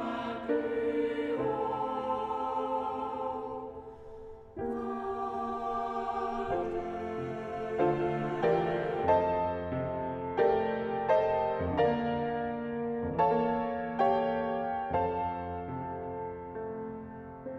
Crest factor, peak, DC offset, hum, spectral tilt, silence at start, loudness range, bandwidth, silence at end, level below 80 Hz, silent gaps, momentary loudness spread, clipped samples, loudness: 18 dB; -14 dBFS; under 0.1%; none; -8 dB/octave; 0 s; 6 LU; 7.6 kHz; 0 s; -58 dBFS; none; 12 LU; under 0.1%; -32 LUFS